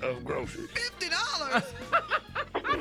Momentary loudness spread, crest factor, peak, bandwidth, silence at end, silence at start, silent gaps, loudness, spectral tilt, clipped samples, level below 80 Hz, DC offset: 7 LU; 20 dB; -12 dBFS; 16 kHz; 0 s; 0 s; none; -30 LUFS; -3 dB/octave; under 0.1%; -54 dBFS; under 0.1%